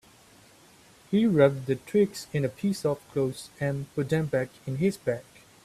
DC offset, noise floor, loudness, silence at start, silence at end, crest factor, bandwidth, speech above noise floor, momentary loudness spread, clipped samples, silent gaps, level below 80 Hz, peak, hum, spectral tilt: under 0.1%; -56 dBFS; -27 LUFS; 1.1 s; 0.45 s; 20 dB; 15 kHz; 29 dB; 9 LU; under 0.1%; none; -62 dBFS; -6 dBFS; none; -7 dB/octave